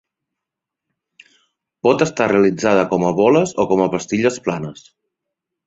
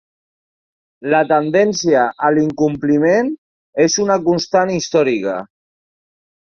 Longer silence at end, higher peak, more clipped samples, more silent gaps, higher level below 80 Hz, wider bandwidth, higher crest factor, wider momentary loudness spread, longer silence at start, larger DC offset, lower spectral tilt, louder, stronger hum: about the same, 0.95 s vs 1.05 s; about the same, -2 dBFS vs -2 dBFS; neither; second, none vs 3.38-3.73 s; about the same, -56 dBFS vs -56 dBFS; about the same, 8 kHz vs 7.4 kHz; about the same, 18 dB vs 16 dB; about the same, 9 LU vs 10 LU; first, 1.85 s vs 1 s; neither; about the same, -5.5 dB/octave vs -4.5 dB/octave; about the same, -17 LUFS vs -15 LUFS; neither